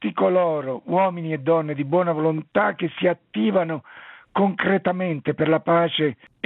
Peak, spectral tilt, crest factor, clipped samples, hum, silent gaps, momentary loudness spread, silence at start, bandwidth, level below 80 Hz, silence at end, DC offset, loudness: -6 dBFS; -10.5 dB/octave; 16 dB; under 0.1%; none; none; 6 LU; 0 s; 4.1 kHz; -68 dBFS; 0.3 s; under 0.1%; -22 LUFS